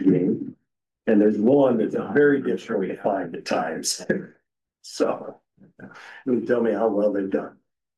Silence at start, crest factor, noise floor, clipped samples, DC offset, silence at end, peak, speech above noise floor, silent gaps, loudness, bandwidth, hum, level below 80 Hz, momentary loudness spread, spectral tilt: 0 s; 14 dB; -76 dBFS; under 0.1%; under 0.1%; 0.45 s; -8 dBFS; 54 dB; none; -23 LUFS; 12.5 kHz; none; -68 dBFS; 15 LU; -5.5 dB/octave